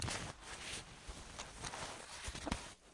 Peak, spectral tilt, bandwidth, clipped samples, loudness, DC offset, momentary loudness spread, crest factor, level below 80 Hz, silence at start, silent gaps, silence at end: -22 dBFS; -3 dB/octave; 11.5 kHz; under 0.1%; -46 LUFS; under 0.1%; 7 LU; 26 dB; -56 dBFS; 0 s; none; 0 s